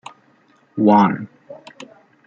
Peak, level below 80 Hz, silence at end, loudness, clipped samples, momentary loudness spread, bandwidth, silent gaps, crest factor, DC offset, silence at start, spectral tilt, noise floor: -2 dBFS; -66 dBFS; 0.75 s; -16 LUFS; under 0.1%; 25 LU; 7.6 kHz; none; 18 dB; under 0.1%; 0.75 s; -8 dB/octave; -56 dBFS